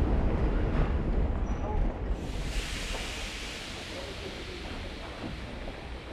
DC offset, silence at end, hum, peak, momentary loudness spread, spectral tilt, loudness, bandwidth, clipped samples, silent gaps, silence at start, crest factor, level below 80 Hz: under 0.1%; 0 s; none; -16 dBFS; 9 LU; -5.5 dB/octave; -34 LUFS; 13 kHz; under 0.1%; none; 0 s; 16 dB; -32 dBFS